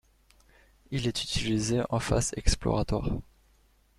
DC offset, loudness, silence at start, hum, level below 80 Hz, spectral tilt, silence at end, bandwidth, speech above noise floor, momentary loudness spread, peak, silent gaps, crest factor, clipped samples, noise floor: under 0.1%; -30 LUFS; 0.9 s; none; -38 dBFS; -4.5 dB/octave; 0.75 s; 14 kHz; 36 dB; 6 LU; -8 dBFS; none; 24 dB; under 0.1%; -64 dBFS